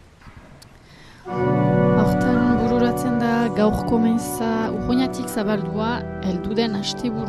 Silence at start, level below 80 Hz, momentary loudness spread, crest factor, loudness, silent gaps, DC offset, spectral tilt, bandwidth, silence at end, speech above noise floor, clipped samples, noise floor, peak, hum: 0.25 s; -40 dBFS; 7 LU; 14 dB; -21 LUFS; none; under 0.1%; -6.5 dB/octave; 13.5 kHz; 0 s; 24 dB; under 0.1%; -45 dBFS; -6 dBFS; none